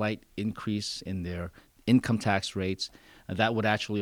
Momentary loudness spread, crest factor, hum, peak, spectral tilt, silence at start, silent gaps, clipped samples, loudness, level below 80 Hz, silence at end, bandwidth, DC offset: 12 LU; 20 dB; none; -10 dBFS; -5.5 dB/octave; 0 s; none; under 0.1%; -30 LUFS; -56 dBFS; 0 s; 17 kHz; under 0.1%